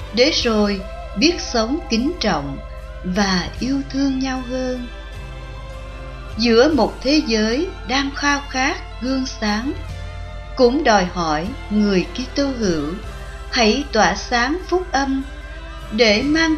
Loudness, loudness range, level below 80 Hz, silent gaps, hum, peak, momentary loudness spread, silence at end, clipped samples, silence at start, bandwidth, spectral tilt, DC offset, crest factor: -19 LUFS; 4 LU; -32 dBFS; none; 50 Hz at -35 dBFS; -2 dBFS; 18 LU; 0 s; under 0.1%; 0 s; 12 kHz; -4.5 dB/octave; under 0.1%; 18 dB